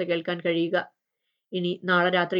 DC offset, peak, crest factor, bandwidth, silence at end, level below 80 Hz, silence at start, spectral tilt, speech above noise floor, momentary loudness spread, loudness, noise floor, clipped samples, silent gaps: under 0.1%; -8 dBFS; 18 dB; 5.6 kHz; 0 s; -88 dBFS; 0 s; -8 dB/octave; 56 dB; 11 LU; -26 LUFS; -81 dBFS; under 0.1%; none